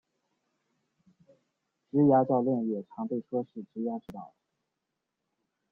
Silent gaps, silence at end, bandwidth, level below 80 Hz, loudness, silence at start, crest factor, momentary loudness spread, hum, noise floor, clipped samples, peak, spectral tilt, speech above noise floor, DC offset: none; 1.45 s; 3.6 kHz; -72 dBFS; -29 LUFS; 1.95 s; 20 dB; 17 LU; none; -85 dBFS; under 0.1%; -12 dBFS; -11.5 dB/octave; 56 dB; under 0.1%